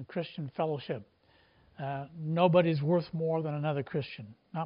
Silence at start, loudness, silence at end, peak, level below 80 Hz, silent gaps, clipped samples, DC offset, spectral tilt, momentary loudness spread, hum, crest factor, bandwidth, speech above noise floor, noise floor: 0 s; -32 LUFS; 0 s; -12 dBFS; -72 dBFS; none; under 0.1%; under 0.1%; -6.5 dB/octave; 16 LU; none; 20 dB; 5.4 kHz; 33 dB; -65 dBFS